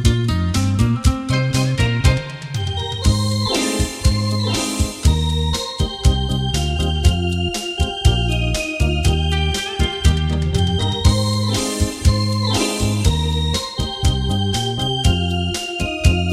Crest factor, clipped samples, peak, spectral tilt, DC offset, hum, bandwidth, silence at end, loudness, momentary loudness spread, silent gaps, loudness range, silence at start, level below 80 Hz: 16 dB; under 0.1%; 0 dBFS; -5 dB/octave; under 0.1%; none; 15 kHz; 0 s; -19 LUFS; 4 LU; none; 1 LU; 0 s; -22 dBFS